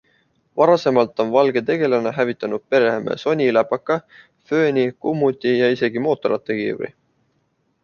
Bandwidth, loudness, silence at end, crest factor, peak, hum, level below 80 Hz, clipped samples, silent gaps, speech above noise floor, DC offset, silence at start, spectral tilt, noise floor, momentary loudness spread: 7 kHz; -19 LUFS; 0.95 s; 18 dB; -2 dBFS; none; -64 dBFS; under 0.1%; none; 48 dB; under 0.1%; 0.55 s; -7 dB/octave; -67 dBFS; 7 LU